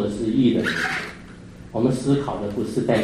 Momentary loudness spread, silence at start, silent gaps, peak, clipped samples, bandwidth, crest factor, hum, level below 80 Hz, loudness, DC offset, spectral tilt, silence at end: 18 LU; 0 s; none; -6 dBFS; under 0.1%; 13 kHz; 16 dB; none; -48 dBFS; -22 LUFS; under 0.1%; -6 dB/octave; 0 s